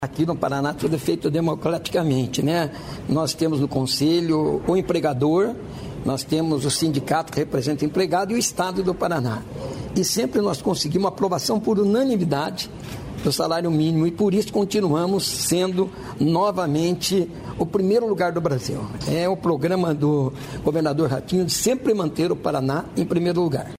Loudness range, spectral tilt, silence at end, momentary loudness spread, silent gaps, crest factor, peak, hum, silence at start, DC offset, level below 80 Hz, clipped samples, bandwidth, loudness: 1 LU; -5.5 dB/octave; 0 s; 6 LU; none; 16 dB; -6 dBFS; none; 0 s; under 0.1%; -48 dBFS; under 0.1%; 16 kHz; -22 LUFS